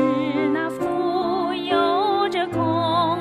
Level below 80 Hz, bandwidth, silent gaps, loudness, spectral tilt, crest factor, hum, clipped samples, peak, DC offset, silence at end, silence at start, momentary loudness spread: -60 dBFS; 13.5 kHz; none; -21 LUFS; -6.5 dB/octave; 12 dB; none; under 0.1%; -8 dBFS; under 0.1%; 0 s; 0 s; 4 LU